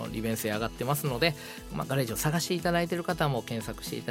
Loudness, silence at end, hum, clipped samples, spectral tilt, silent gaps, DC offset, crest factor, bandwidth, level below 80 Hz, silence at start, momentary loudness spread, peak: -30 LUFS; 0 s; none; under 0.1%; -4.5 dB/octave; none; under 0.1%; 20 dB; 16.5 kHz; -50 dBFS; 0 s; 8 LU; -10 dBFS